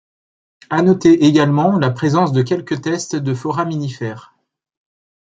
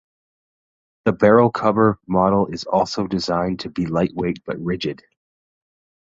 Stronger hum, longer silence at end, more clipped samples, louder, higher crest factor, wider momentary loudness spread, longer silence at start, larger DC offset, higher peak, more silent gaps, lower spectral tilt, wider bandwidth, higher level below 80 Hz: neither; about the same, 1.1 s vs 1.2 s; neither; first, -16 LUFS vs -20 LUFS; about the same, 16 dB vs 20 dB; about the same, 12 LU vs 11 LU; second, 0.7 s vs 1.05 s; neither; about the same, 0 dBFS vs -2 dBFS; neither; about the same, -6.5 dB/octave vs -7 dB/octave; first, 9 kHz vs 7.8 kHz; second, -58 dBFS vs -50 dBFS